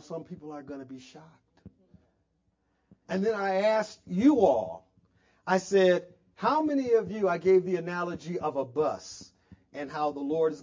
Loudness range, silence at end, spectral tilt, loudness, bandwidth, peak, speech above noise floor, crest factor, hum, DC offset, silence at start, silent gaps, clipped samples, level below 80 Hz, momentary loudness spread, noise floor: 7 LU; 0 s; -6 dB/octave; -27 LUFS; 7.6 kHz; -10 dBFS; 47 dB; 20 dB; none; under 0.1%; 0.1 s; none; under 0.1%; -66 dBFS; 19 LU; -74 dBFS